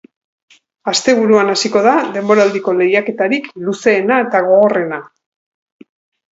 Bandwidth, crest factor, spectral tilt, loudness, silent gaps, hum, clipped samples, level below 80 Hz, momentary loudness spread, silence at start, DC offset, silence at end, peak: 8 kHz; 14 dB; -4 dB/octave; -13 LUFS; none; none; under 0.1%; -64 dBFS; 8 LU; 0.85 s; under 0.1%; 1.25 s; 0 dBFS